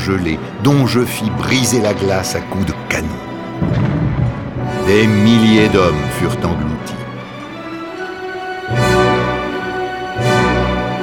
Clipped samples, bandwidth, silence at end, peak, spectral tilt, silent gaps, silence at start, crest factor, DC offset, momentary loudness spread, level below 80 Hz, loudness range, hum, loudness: under 0.1%; 18.5 kHz; 0 s; 0 dBFS; -5.5 dB/octave; none; 0 s; 16 dB; 0.1%; 15 LU; -32 dBFS; 5 LU; none; -15 LUFS